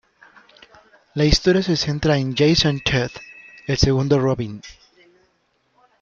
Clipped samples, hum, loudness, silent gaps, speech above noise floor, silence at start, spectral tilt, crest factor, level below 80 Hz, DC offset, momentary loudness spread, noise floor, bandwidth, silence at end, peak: under 0.1%; none; -19 LUFS; none; 47 dB; 1.15 s; -5.5 dB/octave; 18 dB; -34 dBFS; under 0.1%; 16 LU; -66 dBFS; 7.6 kHz; 1.3 s; -2 dBFS